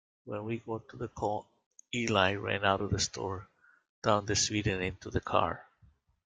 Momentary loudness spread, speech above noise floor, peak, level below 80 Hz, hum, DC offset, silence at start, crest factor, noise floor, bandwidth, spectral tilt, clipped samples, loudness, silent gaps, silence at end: 13 LU; 34 dB; -10 dBFS; -56 dBFS; none; under 0.1%; 0.25 s; 24 dB; -65 dBFS; 9.6 kHz; -3.5 dB/octave; under 0.1%; -32 LUFS; 1.66-1.71 s, 3.89-4.02 s; 0.65 s